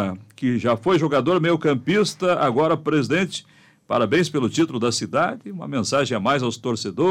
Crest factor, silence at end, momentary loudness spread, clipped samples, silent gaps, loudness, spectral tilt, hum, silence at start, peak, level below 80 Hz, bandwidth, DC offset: 14 dB; 0 s; 7 LU; under 0.1%; none; -21 LUFS; -5.5 dB/octave; none; 0 s; -8 dBFS; -62 dBFS; 14 kHz; under 0.1%